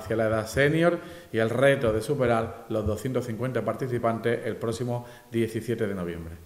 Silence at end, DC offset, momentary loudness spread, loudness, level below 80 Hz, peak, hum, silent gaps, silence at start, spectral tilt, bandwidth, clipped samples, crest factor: 0 s; under 0.1%; 10 LU; -27 LUFS; -54 dBFS; -8 dBFS; none; none; 0 s; -6.5 dB/octave; 16 kHz; under 0.1%; 18 dB